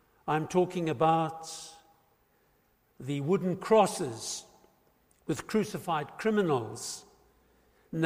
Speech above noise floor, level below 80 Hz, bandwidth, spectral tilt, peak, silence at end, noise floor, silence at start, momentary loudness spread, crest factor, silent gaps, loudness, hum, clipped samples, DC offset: 40 dB; -68 dBFS; 15.5 kHz; -5.5 dB/octave; -12 dBFS; 0 s; -69 dBFS; 0.25 s; 16 LU; 20 dB; none; -30 LUFS; none; under 0.1%; under 0.1%